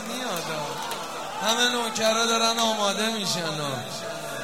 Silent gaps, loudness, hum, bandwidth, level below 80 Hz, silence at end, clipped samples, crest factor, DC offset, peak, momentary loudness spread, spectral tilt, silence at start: none; -25 LUFS; none; 16.5 kHz; -68 dBFS; 0 s; under 0.1%; 18 dB; 0.4%; -8 dBFS; 11 LU; -2 dB/octave; 0 s